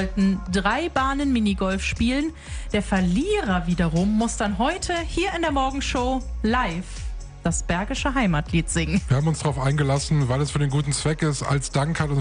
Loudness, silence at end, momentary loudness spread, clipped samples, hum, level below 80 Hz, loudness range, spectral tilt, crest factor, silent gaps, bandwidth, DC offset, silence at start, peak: -23 LUFS; 0 s; 5 LU; under 0.1%; none; -34 dBFS; 2 LU; -5.5 dB/octave; 16 dB; none; 10.5 kHz; under 0.1%; 0 s; -6 dBFS